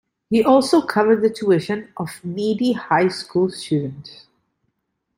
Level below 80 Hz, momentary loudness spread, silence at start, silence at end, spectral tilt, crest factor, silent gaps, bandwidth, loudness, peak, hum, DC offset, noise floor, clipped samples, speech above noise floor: -62 dBFS; 13 LU; 0.3 s; 1.05 s; -6 dB/octave; 18 dB; none; 16 kHz; -19 LUFS; -2 dBFS; none; under 0.1%; -74 dBFS; under 0.1%; 55 dB